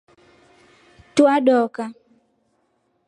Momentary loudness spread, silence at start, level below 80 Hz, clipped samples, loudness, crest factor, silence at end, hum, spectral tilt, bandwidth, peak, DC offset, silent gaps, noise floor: 17 LU; 1.15 s; -68 dBFS; under 0.1%; -18 LUFS; 20 dB; 1.15 s; none; -4.5 dB/octave; 11 kHz; -2 dBFS; under 0.1%; none; -67 dBFS